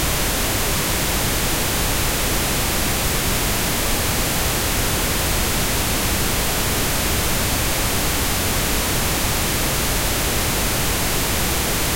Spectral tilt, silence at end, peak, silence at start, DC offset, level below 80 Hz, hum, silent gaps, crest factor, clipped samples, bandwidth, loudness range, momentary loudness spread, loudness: -2.5 dB/octave; 0 s; -4 dBFS; 0 s; under 0.1%; -28 dBFS; none; none; 16 dB; under 0.1%; 16.5 kHz; 0 LU; 0 LU; -19 LUFS